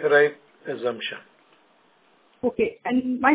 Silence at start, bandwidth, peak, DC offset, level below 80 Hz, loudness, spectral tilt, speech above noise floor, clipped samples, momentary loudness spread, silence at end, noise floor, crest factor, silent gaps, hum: 0 s; 4 kHz; -4 dBFS; under 0.1%; -62 dBFS; -25 LUFS; -8.5 dB/octave; 38 dB; under 0.1%; 16 LU; 0 s; -60 dBFS; 20 dB; none; none